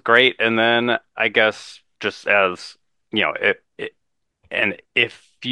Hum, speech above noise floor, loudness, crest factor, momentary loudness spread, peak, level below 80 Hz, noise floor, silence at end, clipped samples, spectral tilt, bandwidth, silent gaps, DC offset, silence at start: none; 44 dB; -19 LUFS; 20 dB; 17 LU; 0 dBFS; -68 dBFS; -64 dBFS; 0 s; under 0.1%; -4 dB/octave; 11 kHz; none; under 0.1%; 0.05 s